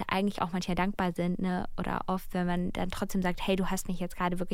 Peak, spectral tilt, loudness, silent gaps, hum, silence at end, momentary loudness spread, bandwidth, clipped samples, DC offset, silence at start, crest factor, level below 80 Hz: -14 dBFS; -6 dB/octave; -32 LUFS; none; none; 0 s; 4 LU; 16.5 kHz; under 0.1%; under 0.1%; 0 s; 16 dB; -42 dBFS